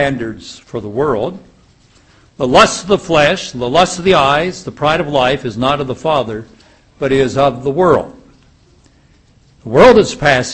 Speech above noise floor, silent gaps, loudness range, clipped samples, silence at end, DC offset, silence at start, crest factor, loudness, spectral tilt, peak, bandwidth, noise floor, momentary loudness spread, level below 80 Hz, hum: 36 dB; none; 4 LU; 0.3%; 0 s; under 0.1%; 0 s; 14 dB; -13 LUFS; -4.5 dB/octave; 0 dBFS; 11 kHz; -49 dBFS; 14 LU; -40 dBFS; none